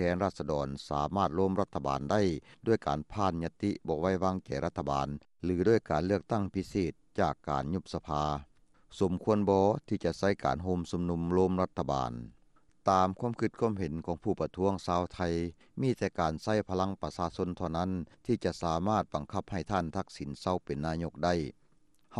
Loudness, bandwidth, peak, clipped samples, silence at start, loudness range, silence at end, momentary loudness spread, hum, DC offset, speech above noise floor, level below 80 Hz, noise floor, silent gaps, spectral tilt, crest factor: -32 LUFS; 11.5 kHz; -12 dBFS; under 0.1%; 0 s; 3 LU; 0 s; 7 LU; none; under 0.1%; 38 dB; -52 dBFS; -70 dBFS; none; -7 dB/octave; 20 dB